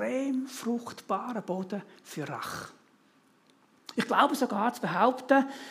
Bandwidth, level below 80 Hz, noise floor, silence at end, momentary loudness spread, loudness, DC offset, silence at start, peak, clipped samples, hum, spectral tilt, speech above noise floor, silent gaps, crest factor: 15.5 kHz; -78 dBFS; -64 dBFS; 0 s; 15 LU; -30 LUFS; under 0.1%; 0 s; -6 dBFS; under 0.1%; none; -5 dB/octave; 35 dB; none; 24 dB